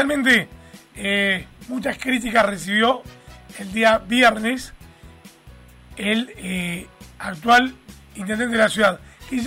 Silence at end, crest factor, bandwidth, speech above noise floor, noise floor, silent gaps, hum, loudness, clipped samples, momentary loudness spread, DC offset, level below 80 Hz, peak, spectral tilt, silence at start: 0 s; 16 dB; 16 kHz; 26 dB; -46 dBFS; none; none; -20 LUFS; under 0.1%; 17 LU; under 0.1%; -48 dBFS; -4 dBFS; -4 dB/octave; 0 s